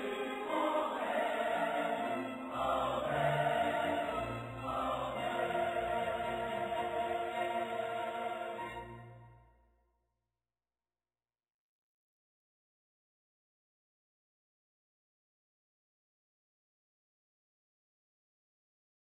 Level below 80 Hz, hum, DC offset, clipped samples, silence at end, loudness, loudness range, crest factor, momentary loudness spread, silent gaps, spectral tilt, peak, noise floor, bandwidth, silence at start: -64 dBFS; none; under 0.1%; under 0.1%; 9.75 s; -36 LUFS; 10 LU; 20 dB; 8 LU; none; -5.5 dB/octave; -20 dBFS; under -90 dBFS; 15 kHz; 0 s